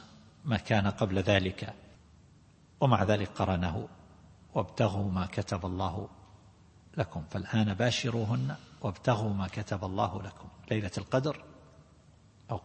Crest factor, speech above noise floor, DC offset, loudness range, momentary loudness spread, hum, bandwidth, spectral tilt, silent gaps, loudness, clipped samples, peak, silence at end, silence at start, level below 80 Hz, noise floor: 24 dB; 29 dB; under 0.1%; 4 LU; 14 LU; none; 8.8 kHz; -6.5 dB/octave; none; -32 LUFS; under 0.1%; -8 dBFS; 0.05 s; 0 s; -56 dBFS; -59 dBFS